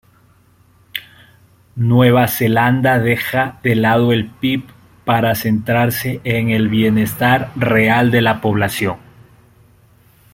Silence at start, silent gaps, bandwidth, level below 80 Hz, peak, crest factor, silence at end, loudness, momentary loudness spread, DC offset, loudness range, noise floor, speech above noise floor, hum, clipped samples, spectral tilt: 0.95 s; none; 16.5 kHz; -48 dBFS; -2 dBFS; 16 dB; 1.35 s; -15 LUFS; 10 LU; under 0.1%; 2 LU; -52 dBFS; 37 dB; none; under 0.1%; -6 dB/octave